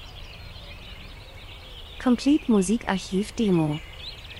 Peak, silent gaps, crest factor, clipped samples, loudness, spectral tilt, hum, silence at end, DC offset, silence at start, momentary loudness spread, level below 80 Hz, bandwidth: -8 dBFS; none; 18 dB; under 0.1%; -24 LUFS; -5.5 dB/octave; none; 0 s; under 0.1%; 0 s; 21 LU; -44 dBFS; 15.5 kHz